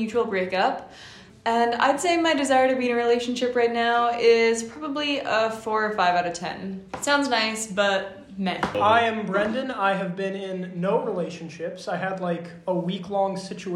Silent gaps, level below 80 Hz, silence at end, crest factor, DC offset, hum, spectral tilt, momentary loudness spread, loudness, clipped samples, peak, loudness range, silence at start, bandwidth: none; -62 dBFS; 0 s; 18 dB; under 0.1%; none; -4 dB/octave; 12 LU; -24 LUFS; under 0.1%; -6 dBFS; 6 LU; 0 s; 13 kHz